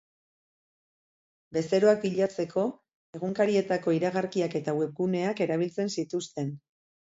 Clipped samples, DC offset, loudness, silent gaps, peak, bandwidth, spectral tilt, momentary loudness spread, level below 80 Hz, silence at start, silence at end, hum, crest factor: under 0.1%; under 0.1%; -28 LUFS; 2.94-3.13 s; -10 dBFS; 8 kHz; -6 dB/octave; 11 LU; -72 dBFS; 1.5 s; 0.45 s; none; 20 dB